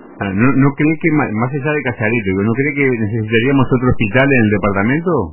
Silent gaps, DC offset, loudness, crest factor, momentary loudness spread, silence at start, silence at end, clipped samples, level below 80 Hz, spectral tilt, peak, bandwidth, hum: none; under 0.1%; -14 LUFS; 14 dB; 5 LU; 0 s; 0 s; under 0.1%; -38 dBFS; -11.5 dB/octave; 0 dBFS; 3.1 kHz; none